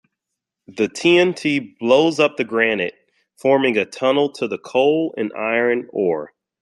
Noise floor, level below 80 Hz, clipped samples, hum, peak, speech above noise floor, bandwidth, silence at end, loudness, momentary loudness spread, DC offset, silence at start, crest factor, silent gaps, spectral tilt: -82 dBFS; -66 dBFS; under 0.1%; none; -2 dBFS; 64 dB; 11.5 kHz; 0.35 s; -19 LUFS; 9 LU; under 0.1%; 0.7 s; 18 dB; none; -5 dB/octave